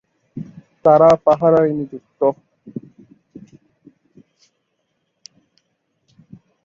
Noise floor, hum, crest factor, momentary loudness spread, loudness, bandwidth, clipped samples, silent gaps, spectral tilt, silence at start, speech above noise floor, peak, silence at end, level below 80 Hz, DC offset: -71 dBFS; none; 20 dB; 24 LU; -15 LUFS; 7.2 kHz; under 0.1%; none; -8 dB/octave; 0.35 s; 57 dB; -2 dBFS; 3.85 s; -58 dBFS; under 0.1%